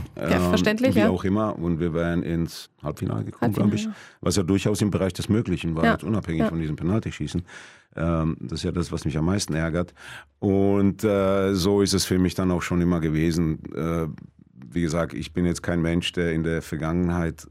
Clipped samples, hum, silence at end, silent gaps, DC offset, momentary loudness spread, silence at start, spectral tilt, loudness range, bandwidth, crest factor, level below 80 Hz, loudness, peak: under 0.1%; none; 0.05 s; none; under 0.1%; 9 LU; 0 s; -6 dB/octave; 4 LU; 15.5 kHz; 18 dB; -46 dBFS; -24 LUFS; -6 dBFS